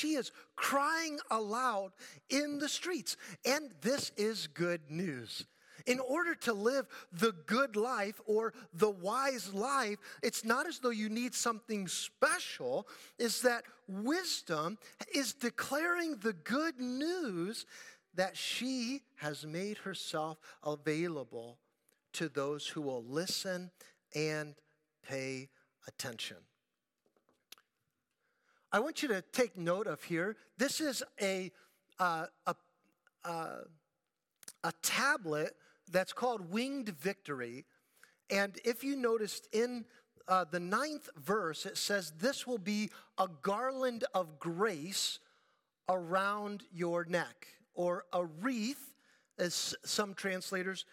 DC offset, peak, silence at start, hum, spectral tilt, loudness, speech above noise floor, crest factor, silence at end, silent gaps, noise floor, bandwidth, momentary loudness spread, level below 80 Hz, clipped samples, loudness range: under 0.1%; -16 dBFS; 0 s; none; -3.5 dB/octave; -36 LUFS; 51 dB; 22 dB; 0.1 s; none; -88 dBFS; 17.5 kHz; 11 LU; -90 dBFS; under 0.1%; 5 LU